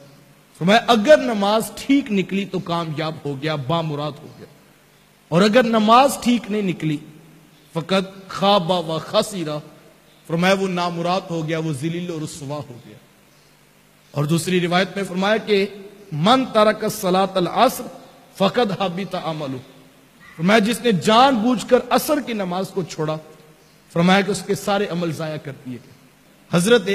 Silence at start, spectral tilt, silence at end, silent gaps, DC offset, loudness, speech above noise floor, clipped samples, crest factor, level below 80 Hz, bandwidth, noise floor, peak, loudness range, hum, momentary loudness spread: 0.6 s; -5 dB/octave; 0 s; none; under 0.1%; -19 LUFS; 34 dB; under 0.1%; 18 dB; -58 dBFS; 15.5 kHz; -53 dBFS; -2 dBFS; 5 LU; none; 15 LU